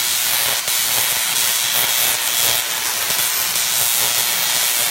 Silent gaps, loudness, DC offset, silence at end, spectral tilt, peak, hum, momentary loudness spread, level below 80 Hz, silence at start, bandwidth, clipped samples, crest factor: none; -15 LUFS; under 0.1%; 0 s; 1.5 dB/octave; 0 dBFS; none; 2 LU; -56 dBFS; 0 s; 16 kHz; under 0.1%; 18 dB